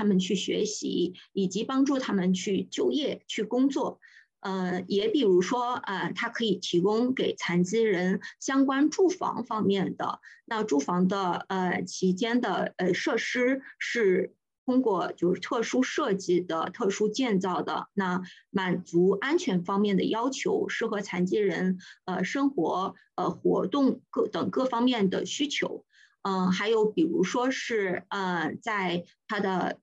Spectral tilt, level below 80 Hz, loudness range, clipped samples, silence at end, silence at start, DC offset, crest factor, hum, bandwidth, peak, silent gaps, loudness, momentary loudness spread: -5.5 dB/octave; -76 dBFS; 2 LU; under 0.1%; 0.05 s; 0 s; under 0.1%; 14 dB; none; 8.6 kHz; -14 dBFS; 14.58-14.66 s; -28 LUFS; 7 LU